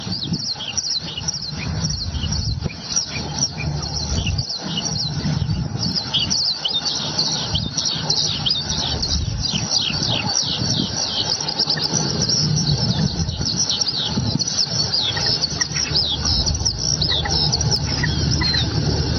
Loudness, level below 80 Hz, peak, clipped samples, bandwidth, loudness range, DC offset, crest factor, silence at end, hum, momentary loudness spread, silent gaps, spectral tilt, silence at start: -19 LUFS; -34 dBFS; -4 dBFS; under 0.1%; 7.2 kHz; 4 LU; under 0.1%; 16 dB; 0 s; none; 6 LU; none; -3 dB/octave; 0 s